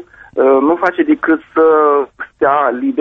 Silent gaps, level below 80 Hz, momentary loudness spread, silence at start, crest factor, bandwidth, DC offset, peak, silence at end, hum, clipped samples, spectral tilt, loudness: none; -54 dBFS; 6 LU; 0.35 s; 12 dB; 5.6 kHz; under 0.1%; 0 dBFS; 0 s; none; under 0.1%; -7.5 dB/octave; -13 LUFS